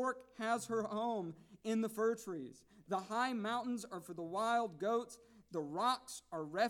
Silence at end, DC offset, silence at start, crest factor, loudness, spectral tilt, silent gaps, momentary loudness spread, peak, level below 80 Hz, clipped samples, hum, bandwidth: 0 s; under 0.1%; 0 s; 18 dB; -39 LUFS; -4.5 dB/octave; none; 11 LU; -22 dBFS; -80 dBFS; under 0.1%; none; 17 kHz